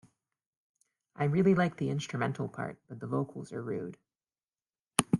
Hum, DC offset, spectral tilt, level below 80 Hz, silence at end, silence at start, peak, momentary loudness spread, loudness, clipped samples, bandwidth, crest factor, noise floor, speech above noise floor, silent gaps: none; under 0.1%; -5.5 dB/octave; -68 dBFS; 0 s; 1.2 s; -2 dBFS; 14 LU; -32 LUFS; under 0.1%; 11.5 kHz; 32 dB; under -90 dBFS; over 58 dB; none